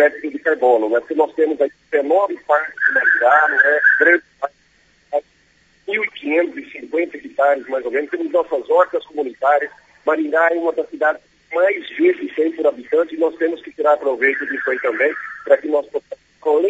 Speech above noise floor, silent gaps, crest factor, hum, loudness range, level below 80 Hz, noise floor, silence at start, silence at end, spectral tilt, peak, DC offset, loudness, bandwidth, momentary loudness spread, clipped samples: 39 dB; none; 18 dB; none; 6 LU; -68 dBFS; -56 dBFS; 0 s; 0 s; -4.5 dB/octave; 0 dBFS; under 0.1%; -18 LUFS; 8 kHz; 12 LU; under 0.1%